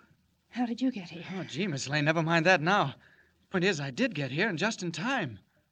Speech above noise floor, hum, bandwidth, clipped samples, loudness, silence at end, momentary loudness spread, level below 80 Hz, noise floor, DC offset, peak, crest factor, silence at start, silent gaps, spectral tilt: 37 dB; none; 9.4 kHz; under 0.1%; -29 LUFS; 0.35 s; 14 LU; -74 dBFS; -67 dBFS; under 0.1%; -8 dBFS; 22 dB; 0.55 s; none; -5 dB/octave